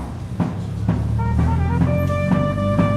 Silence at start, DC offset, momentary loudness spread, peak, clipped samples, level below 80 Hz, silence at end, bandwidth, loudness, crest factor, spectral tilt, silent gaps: 0 s; under 0.1%; 6 LU; -6 dBFS; under 0.1%; -28 dBFS; 0 s; 14 kHz; -20 LUFS; 14 dB; -8.5 dB/octave; none